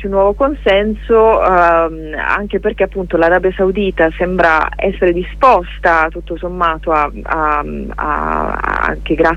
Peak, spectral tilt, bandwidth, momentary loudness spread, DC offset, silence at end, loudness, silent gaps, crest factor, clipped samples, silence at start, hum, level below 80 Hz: 0 dBFS; -7 dB/octave; 8.8 kHz; 8 LU; under 0.1%; 0 s; -14 LUFS; none; 14 dB; under 0.1%; 0 s; 50 Hz at -30 dBFS; -28 dBFS